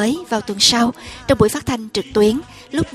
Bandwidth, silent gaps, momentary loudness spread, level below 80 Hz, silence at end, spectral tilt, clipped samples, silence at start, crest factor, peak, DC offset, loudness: 15 kHz; none; 11 LU; -40 dBFS; 0 s; -3.5 dB/octave; under 0.1%; 0 s; 18 dB; 0 dBFS; under 0.1%; -17 LUFS